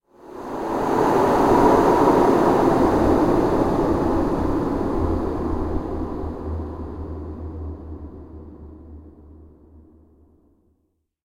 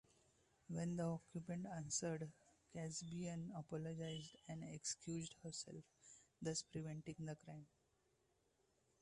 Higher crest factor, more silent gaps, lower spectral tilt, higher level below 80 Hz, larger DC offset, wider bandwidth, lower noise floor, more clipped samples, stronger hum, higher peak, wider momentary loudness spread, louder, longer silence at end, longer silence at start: about the same, 18 dB vs 20 dB; neither; first, -7.5 dB/octave vs -4.5 dB/octave; first, -34 dBFS vs -78 dBFS; neither; first, 17 kHz vs 11.5 kHz; second, -70 dBFS vs -82 dBFS; neither; neither; first, -4 dBFS vs -32 dBFS; first, 21 LU vs 12 LU; first, -20 LUFS vs -49 LUFS; first, 1.95 s vs 1.35 s; second, 0.25 s vs 0.7 s